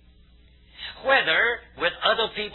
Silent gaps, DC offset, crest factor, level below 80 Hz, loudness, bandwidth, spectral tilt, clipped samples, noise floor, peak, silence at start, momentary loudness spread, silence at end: none; under 0.1%; 18 dB; -54 dBFS; -22 LUFS; 4.3 kHz; -5 dB/octave; under 0.1%; -54 dBFS; -6 dBFS; 0.8 s; 14 LU; 0 s